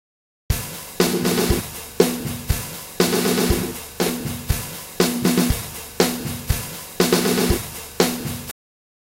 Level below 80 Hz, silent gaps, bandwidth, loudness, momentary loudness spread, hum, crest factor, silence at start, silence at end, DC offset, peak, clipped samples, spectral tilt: -34 dBFS; none; 16.5 kHz; -22 LUFS; 13 LU; none; 22 dB; 0.5 s; 0.5 s; under 0.1%; 0 dBFS; under 0.1%; -4 dB/octave